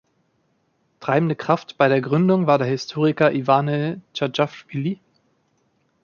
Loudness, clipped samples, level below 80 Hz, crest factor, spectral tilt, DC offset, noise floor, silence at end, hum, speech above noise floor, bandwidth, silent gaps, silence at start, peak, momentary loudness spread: -21 LUFS; under 0.1%; -66 dBFS; 20 dB; -7 dB/octave; under 0.1%; -67 dBFS; 1.1 s; none; 47 dB; 7 kHz; none; 1 s; -2 dBFS; 9 LU